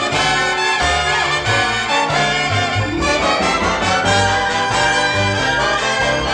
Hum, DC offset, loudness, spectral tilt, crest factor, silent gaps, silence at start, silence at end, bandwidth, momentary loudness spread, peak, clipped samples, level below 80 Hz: none; under 0.1%; -15 LUFS; -3 dB/octave; 14 dB; none; 0 s; 0 s; 12 kHz; 2 LU; -4 dBFS; under 0.1%; -34 dBFS